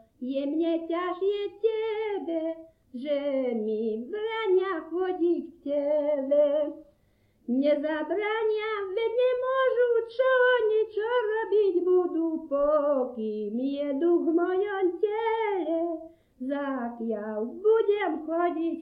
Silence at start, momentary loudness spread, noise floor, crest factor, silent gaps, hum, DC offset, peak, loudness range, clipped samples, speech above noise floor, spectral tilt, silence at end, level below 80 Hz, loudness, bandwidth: 0.2 s; 8 LU; -66 dBFS; 14 dB; none; none; under 0.1%; -14 dBFS; 5 LU; under 0.1%; 39 dB; -7.5 dB/octave; 0 s; -68 dBFS; -27 LUFS; 5.2 kHz